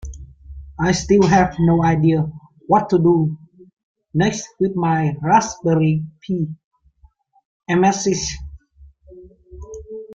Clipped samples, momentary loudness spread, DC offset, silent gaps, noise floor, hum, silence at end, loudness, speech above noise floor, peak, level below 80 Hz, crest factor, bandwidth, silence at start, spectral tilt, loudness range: under 0.1%; 21 LU; under 0.1%; 3.73-3.77 s, 3.83-3.95 s, 6.64-6.71 s, 7.45-7.60 s; -54 dBFS; none; 0 s; -18 LUFS; 37 dB; -2 dBFS; -42 dBFS; 18 dB; 7.8 kHz; 0.05 s; -6 dB/octave; 7 LU